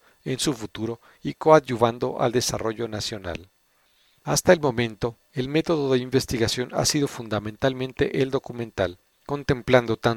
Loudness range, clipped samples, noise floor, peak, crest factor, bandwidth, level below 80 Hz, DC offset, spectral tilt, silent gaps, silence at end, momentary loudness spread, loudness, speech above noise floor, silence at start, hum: 2 LU; under 0.1%; -64 dBFS; 0 dBFS; 24 dB; 18.5 kHz; -50 dBFS; under 0.1%; -4.5 dB/octave; none; 0 s; 13 LU; -24 LUFS; 40 dB; 0.25 s; none